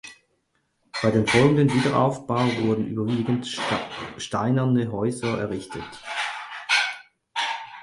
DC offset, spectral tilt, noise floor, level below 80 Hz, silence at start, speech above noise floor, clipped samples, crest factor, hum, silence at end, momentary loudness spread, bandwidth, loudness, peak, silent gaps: under 0.1%; -5.5 dB/octave; -71 dBFS; -56 dBFS; 0.05 s; 48 dB; under 0.1%; 20 dB; none; 0 s; 14 LU; 11.5 kHz; -24 LUFS; -4 dBFS; none